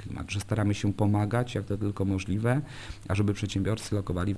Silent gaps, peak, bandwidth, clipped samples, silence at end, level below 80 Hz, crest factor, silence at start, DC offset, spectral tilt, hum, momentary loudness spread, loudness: none; -12 dBFS; 11 kHz; under 0.1%; 0 s; -48 dBFS; 18 dB; 0 s; under 0.1%; -6.5 dB/octave; none; 6 LU; -29 LUFS